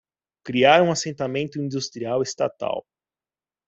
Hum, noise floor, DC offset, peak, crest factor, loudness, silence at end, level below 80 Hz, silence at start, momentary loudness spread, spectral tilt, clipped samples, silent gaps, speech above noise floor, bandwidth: none; under -90 dBFS; under 0.1%; -2 dBFS; 22 dB; -22 LUFS; 0.9 s; -66 dBFS; 0.45 s; 13 LU; -4.5 dB/octave; under 0.1%; none; over 68 dB; 8.2 kHz